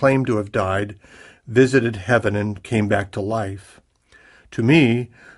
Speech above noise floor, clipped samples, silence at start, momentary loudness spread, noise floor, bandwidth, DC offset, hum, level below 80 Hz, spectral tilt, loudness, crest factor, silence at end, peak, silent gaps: 34 dB; under 0.1%; 0 s; 10 LU; -53 dBFS; 11.5 kHz; under 0.1%; none; -52 dBFS; -7 dB/octave; -20 LUFS; 18 dB; 0.3 s; -2 dBFS; none